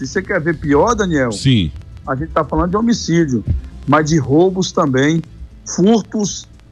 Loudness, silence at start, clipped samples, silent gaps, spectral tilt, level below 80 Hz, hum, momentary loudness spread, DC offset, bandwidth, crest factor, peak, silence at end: -16 LUFS; 0 s; under 0.1%; none; -5.5 dB/octave; -32 dBFS; none; 10 LU; under 0.1%; 11 kHz; 12 dB; -2 dBFS; 0.3 s